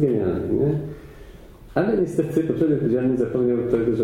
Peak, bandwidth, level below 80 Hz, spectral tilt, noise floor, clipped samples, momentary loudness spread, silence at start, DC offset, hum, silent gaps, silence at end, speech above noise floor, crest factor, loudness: -6 dBFS; 13.5 kHz; -46 dBFS; -9 dB/octave; -43 dBFS; under 0.1%; 7 LU; 0 s; under 0.1%; none; none; 0 s; 22 dB; 16 dB; -22 LUFS